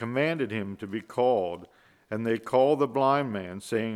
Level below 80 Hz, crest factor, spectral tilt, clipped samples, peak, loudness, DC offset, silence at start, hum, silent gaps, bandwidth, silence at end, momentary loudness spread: -72 dBFS; 18 dB; -6.5 dB/octave; under 0.1%; -10 dBFS; -27 LUFS; under 0.1%; 0 s; none; none; 14 kHz; 0 s; 11 LU